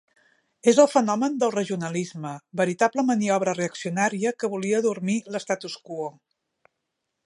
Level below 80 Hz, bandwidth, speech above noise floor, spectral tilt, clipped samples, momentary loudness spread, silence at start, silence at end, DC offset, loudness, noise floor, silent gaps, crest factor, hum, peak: -74 dBFS; 11.5 kHz; 57 dB; -5 dB/octave; under 0.1%; 14 LU; 0.65 s; 1.15 s; under 0.1%; -24 LUFS; -80 dBFS; none; 22 dB; none; -4 dBFS